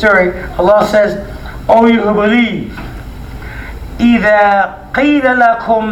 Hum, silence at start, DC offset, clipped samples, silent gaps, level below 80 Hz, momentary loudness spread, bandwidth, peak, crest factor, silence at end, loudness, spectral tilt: none; 0 s; under 0.1%; 0.2%; none; -30 dBFS; 19 LU; 15 kHz; 0 dBFS; 12 dB; 0 s; -10 LUFS; -6.5 dB/octave